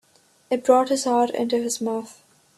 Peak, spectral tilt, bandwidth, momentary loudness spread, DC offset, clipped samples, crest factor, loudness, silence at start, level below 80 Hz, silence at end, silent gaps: -4 dBFS; -3.5 dB/octave; 13 kHz; 10 LU; under 0.1%; under 0.1%; 20 dB; -22 LUFS; 0.5 s; -70 dBFS; 0.45 s; none